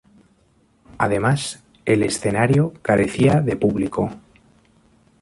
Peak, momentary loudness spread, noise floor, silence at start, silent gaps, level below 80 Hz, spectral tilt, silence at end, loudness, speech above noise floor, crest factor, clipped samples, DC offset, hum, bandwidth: -4 dBFS; 8 LU; -59 dBFS; 0.95 s; none; -48 dBFS; -6 dB/octave; 1.05 s; -20 LUFS; 41 dB; 18 dB; under 0.1%; under 0.1%; none; 11.5 kHz